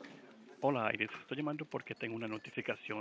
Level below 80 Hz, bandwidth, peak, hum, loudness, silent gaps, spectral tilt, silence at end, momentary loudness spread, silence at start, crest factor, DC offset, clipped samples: -82 dBFS; 8 kHz; -18 dBFS; none; -39 LUFS; none; -6.5 dB/octave; 0 s; 13 LU; 0 s; 22 dB; under 0.1%; under 0.1%